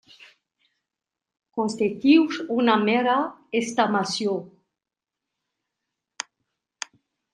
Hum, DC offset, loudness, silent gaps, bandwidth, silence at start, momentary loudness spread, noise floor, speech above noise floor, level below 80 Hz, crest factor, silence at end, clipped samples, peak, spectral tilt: none; under 0.1%; -22 LUFS; none; 11 kHz; 1.55 s; 19 LU; -88 dBFS; 66 dB; -74 dBFS; 22 dB; 2.85 s; under 0.1%; -4 dBFS; -4.5 dB/octave